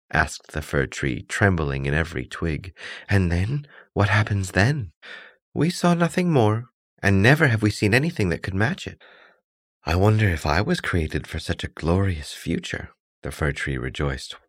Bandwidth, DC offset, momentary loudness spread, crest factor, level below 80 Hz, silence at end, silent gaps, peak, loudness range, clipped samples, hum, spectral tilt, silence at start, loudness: 15 kHz; under 0.1%; 13 LU; 20 dB; -38 dBFS; 0.1 s; 4.96-5.01 s, 5.42-5.52 s, 6.74-6.97 s, 9.44-9.81 s, 13.00-13.22 s; -4 dBFS; 5 LU; under 0.1%; none; -6 dB/octave; 0.15 s; -23 LUFS